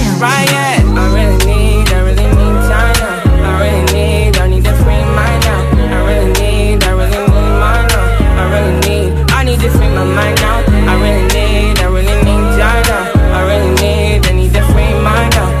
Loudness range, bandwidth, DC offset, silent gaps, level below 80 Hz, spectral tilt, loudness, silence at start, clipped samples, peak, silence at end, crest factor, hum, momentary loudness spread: 1 LU; 15 kHz; under 0.1%; none; -12 dBFS; -5.5 dB/octave; -11 LUFS; 0 s; under 0.1%; 0 dBFS; 0 s; 8 dB; none; 1 LU